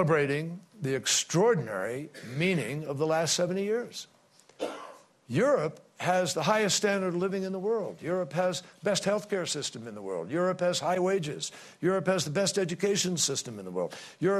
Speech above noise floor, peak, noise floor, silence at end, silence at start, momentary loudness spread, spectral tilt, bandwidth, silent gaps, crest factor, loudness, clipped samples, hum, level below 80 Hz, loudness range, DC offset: 21 dB; -12 dBFS; -49 dBFS; 0 s; 0 s; 12 LU; -4 dB/octave; 14 kHz; none; 18 dB; -29 LUFS; under 0.1%; none; -72 dBFS; 3 LU; under 0.1%